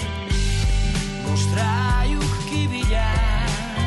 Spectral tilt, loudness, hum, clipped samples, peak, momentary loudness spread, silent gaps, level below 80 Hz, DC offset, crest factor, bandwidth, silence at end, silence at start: -5 dB/octave; -22 LUFS; none; under 0.1%; -10 dBFS; 4 LU; none; -24 dBFS; under 0.1%; 10 dB; 11.5 kHz; 0 s; 0 s